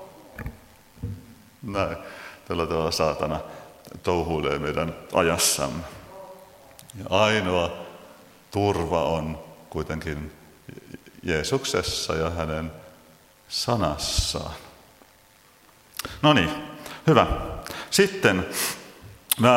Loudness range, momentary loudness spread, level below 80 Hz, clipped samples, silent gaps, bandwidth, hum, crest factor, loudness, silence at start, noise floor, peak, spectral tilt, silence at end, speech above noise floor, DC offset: 6 LU; 22 LU; -44 dBFS; under 0.1%; none; 16.5 kHz; none; 26 dB; -25 LUFS; 0 s; -56 dBFS; 0 dBFS; -4 dB/octave; 0 s; 31 dB; under 0.1%